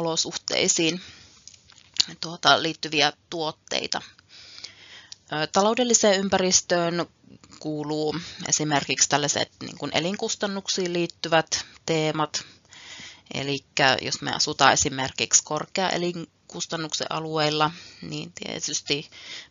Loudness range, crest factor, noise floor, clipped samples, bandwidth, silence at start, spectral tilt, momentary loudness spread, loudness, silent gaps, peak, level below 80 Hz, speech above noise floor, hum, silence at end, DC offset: 4 LU; 26 dB; -51 dBFS; under 0.1%; 7.6 kHz; 0 s; -2 dB/octave; 18 LU; -24 LUFS; none; 0 dBFS; -62 dBFS; 26 dB; none; 0.05 s; under 0.1%